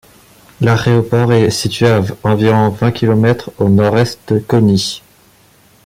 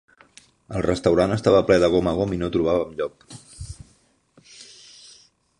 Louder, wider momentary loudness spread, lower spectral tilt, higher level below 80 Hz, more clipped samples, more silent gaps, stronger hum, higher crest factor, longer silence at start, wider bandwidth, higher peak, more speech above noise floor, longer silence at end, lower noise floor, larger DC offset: first, -13 LUFS vs -21 LUFS; second, 5 LU vs 25 LU; about the same, -6.5 dB/octave vs -6.5 dB/octave; about the same, -44 dBFS vs -44 dBFS; neither; neither; neither; second, 12 dB vs 20 dB; about the same, 0.6 s vs 0.7 s; first, 15.5 kHz vs 11 kHz; about the same, -2 dBFS vs -4 dBFS; second, 36 dB vs 40 dB; about the same, 0.85 s vs 0.95 s; second, -48 dBFS vs -61 dBFS; neither